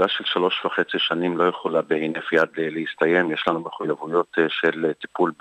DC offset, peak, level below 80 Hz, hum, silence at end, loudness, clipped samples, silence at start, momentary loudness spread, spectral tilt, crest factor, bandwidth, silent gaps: under 0.1%; -6 dBFS; -70 dBFS; none; 0.1 s; -22 LUFS; under 0.1%; 0 s; 6 LU; -6 dB/octave; 16 dB; 8.4 kHz; none